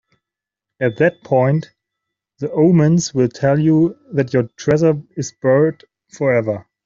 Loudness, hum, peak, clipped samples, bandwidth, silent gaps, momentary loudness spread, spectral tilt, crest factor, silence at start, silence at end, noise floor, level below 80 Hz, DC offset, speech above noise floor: -17 LUFS; none; -2 dBFS; under 0.1%; 7.6 kHz; none; 8 LU; -7 dB/octave; 14 dB; 0.8 s; 0.25 s; -85 dBFS; -56 dBFS; under 0.1%; 69 dB